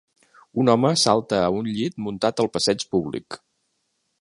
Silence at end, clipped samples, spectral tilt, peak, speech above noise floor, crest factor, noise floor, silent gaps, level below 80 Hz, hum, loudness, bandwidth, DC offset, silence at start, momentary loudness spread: 0.85 s; under 0.1%; -4.5 dB/octave; -2 dBFS; 51 dB; 20 dB; -73 dBFS; none; -56 dBFS; none; -22 LUFS; 11.5 kHz; under 0.1%; 0.55 s; 13 LU